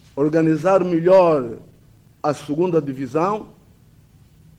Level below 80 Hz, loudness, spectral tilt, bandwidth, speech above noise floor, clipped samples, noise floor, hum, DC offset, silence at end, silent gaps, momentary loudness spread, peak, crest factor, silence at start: -58 dBFS; -19 LUFS; -8 dB/octave; 11 kHz; 33 dB; under 0.1%; -51 dBFS; none; under 0.1%; 1.15 s; none; 12 LU; -4 dBFS; 16 dB; 0.15 s